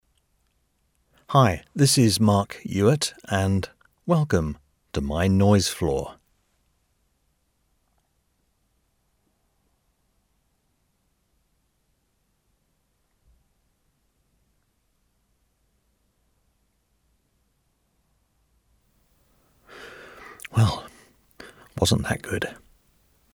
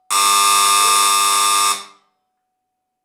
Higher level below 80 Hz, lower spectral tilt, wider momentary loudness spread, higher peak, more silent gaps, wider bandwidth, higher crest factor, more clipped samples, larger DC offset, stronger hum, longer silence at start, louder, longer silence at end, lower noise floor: first, -48 dBFS vs -80 dBFS; first, -5.5 dB/octave vs 3 dB/octave; first, 22 LU vs 5 LU; about the same, -6 dBFS vs -4 dBFS; neither; second, 17 kHz vs over 20 kHz; first, 22 dB vs 14 dB; neither; neither; neither; first, 1.3 s vs 0.1 s; second, -23 LUFS vs -12 LUFS; second, 0.8 s vs 1.2 s; second, -71 dBFS vs -75 dBFS